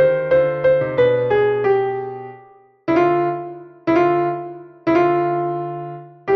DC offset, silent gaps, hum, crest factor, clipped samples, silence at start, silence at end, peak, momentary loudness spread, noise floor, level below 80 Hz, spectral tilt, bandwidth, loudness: under 0.1%; none; none; 14 dB; under 0.1%; 0 s; 0 s; -4 dBFS; 15 LU; -47 dBFS; -56 dBFS; -8.5 dB/octave; 6.2 kHz; -18 LUFS